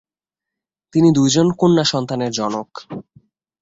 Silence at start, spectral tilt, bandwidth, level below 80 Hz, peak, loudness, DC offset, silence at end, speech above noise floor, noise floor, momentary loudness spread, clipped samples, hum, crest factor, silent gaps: 0.95 s; -5.5 dB/octave; 8 kHz; -54 dBFS; -2 dBFS; -17 LUFS; under 0.1%; 0.6 s; 70 dB; -87 dBFS; 19 LU; under 0.1%; none; 16 dB; none